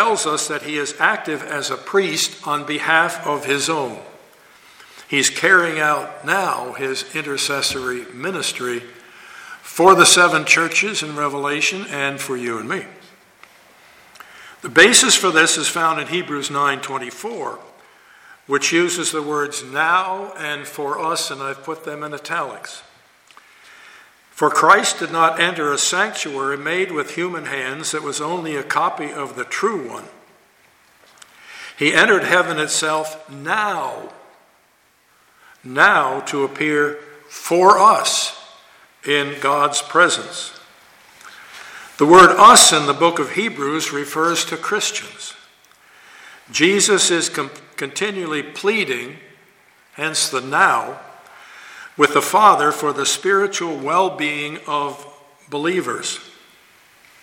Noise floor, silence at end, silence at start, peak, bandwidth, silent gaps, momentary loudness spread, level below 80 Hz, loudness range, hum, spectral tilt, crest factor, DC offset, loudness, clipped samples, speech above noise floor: -57 dBFS; 0.95 s; 0 s; 0 dBFS; 17 kHz; none; 17 LU; -62 dBFS; 10 LU; none; -2 dB/octave; 18 dB; under 0.1%; -17 LUFS; under 0.1%; 40 dB